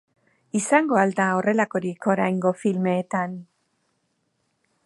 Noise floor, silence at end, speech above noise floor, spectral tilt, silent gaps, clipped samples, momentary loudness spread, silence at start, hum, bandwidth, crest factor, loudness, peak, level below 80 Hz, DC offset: -72 dBFS; 1.4 s; 50 dB; -6 dB/octave; none; under 0.1%; 8 LU; 0.55 s; none; 11.5 kHz; 20 dB; -23 LUFS; -4 dBFS; -72 dBFS; under 0.1%